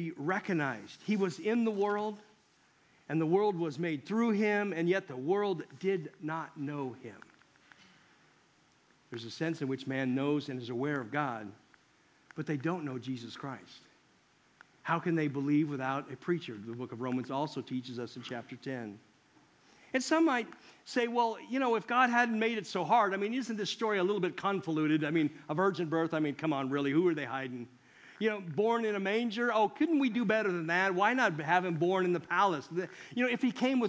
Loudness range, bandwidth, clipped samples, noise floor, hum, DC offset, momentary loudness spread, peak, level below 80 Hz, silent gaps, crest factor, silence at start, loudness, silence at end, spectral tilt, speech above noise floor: 10 LU; 8 kHz; under 0.1%; -67 dBFS; none; under 0.1%; 13 LU; -12 dBFS; -82 dBFS; none; 20 dB; 0 s; -32 LUFS; 0 s; -6 dB/octave; 35 dB